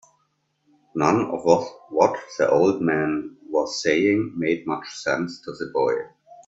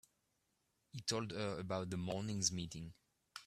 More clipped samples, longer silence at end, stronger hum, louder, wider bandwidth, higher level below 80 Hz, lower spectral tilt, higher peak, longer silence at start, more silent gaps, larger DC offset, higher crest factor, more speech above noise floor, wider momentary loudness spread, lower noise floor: neither; first, 0.15 s vs 0 s; neither; first, -23 LUFS vs -41 LUFS; second, 8 kHz vs 15 kHz; first, -62 dBFS vs -70 dBFS; first, -5.5 dB/octave vs -4 dB/octave; first, -2 dBFS vs -20 dBFS; about the same, 0.95 s vs 0.95 s; neither; neither; about the same, 20 dB vs 24 dB; first, 48 dB vs 41 dB; second, 10 LU vs 16 LU; second, -70 dBFS vs -83 dBFS